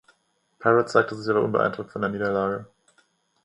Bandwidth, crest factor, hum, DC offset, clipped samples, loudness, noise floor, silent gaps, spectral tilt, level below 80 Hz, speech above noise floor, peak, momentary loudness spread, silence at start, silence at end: 10.5 kHz; 24 dB; none; under 0.1%; under 0.1%; -24 LUFS; -68 dBFS; none; -6.5 dB/octave; -62 dBFS; 45 dB; -2 dBFS; 9 LU; 0.6 s; 0.8 s